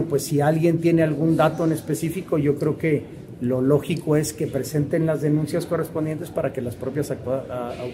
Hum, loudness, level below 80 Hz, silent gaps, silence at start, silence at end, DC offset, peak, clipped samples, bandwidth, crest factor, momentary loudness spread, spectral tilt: none; -23 LUFS; -54 dBFS; none; 0 s; 0 s; under 0.1%; -6 dBFS; under 0.1%; 16 kHz; 18 dB; 8 LU; -7 dB/octave